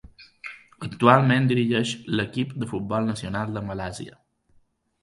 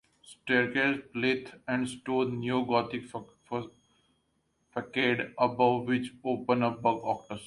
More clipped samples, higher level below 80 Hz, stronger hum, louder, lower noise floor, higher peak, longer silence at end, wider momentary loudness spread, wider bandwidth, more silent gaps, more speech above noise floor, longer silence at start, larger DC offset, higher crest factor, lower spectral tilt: neither; first, -54 dBFS vs -68 dBFS; neither; first, -23 LUFS vs -30 LUFS; second, -62 dBFS vs -75 dBFS; first, 0 dBFS vs -12 dBFS; first, 0.95 s vs 0 s; first, 22 LU vs 12 LU; about the same, 11.5 kHz vs 11.5 kHz; neither; second, 39 dB vs 45 dB; second, 0.05 s vs 0.3 s; neither; about the same, 24 dB vs 20 dB; about the same, -6.5 dB/octave vs -6 dB/octave